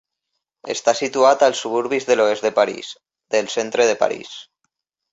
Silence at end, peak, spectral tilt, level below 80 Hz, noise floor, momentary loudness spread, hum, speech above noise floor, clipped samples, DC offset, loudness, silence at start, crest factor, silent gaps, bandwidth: 0.7 s; -2 dBFS; -2.5 dB/octave; -68 dBFS; -78 dBFS; 17 LU; none; 59 dB; under 0.1%; under 0.1%; -19 LUFS; 0.65 s; 18 dB; none; 8 kHz